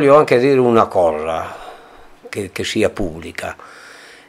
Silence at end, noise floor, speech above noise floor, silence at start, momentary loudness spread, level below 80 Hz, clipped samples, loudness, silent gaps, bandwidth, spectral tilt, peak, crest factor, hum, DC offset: 0.4 s; -42 dBFS; 26 dB; 0 s; 21 LU; -42 dBFS; under 0.1%; -16 LUFS; none; 15.5 kHz; -5.5 dB/octave; 0 dBFS; 16 dB; none; under 0.1%